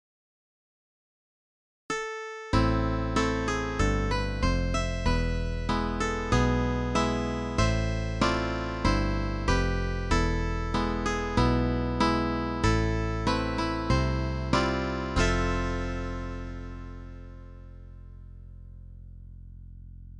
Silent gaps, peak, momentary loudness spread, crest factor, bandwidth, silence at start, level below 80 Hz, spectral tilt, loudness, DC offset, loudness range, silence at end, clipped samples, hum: none; -10 dBFS; 22 LU; 18 dB; 11 kHz; 1.9 s; -34 dBFS; -6 dB/octave; -28 LUFS; under 0.1%; 8 LU; 0 s; under 0.1%; none